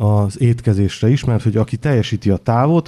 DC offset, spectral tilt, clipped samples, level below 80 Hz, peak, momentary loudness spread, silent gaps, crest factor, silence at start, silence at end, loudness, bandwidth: under 0.1%; -8 dB/octave; under 0.1%; -42 dBFS; -2 dBFS; 3 LU; none; 14 dB; 0 s; 0.05 s; -16 LUFS; 11 kHz